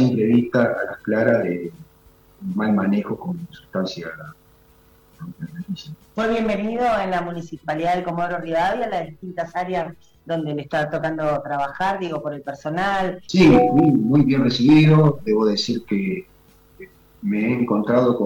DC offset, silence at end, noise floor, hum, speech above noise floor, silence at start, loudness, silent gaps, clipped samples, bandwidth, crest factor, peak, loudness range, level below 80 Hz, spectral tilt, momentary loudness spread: under 0.1%; 0 s; -53 dBFS; none; 33 dB; 0 s; -20 LUFS; none; under 0.1%; 16.5 kHz; 16 dB; -4 dBFS; 10 LU; -48 dBFS; -7 dB/octave; 17 LU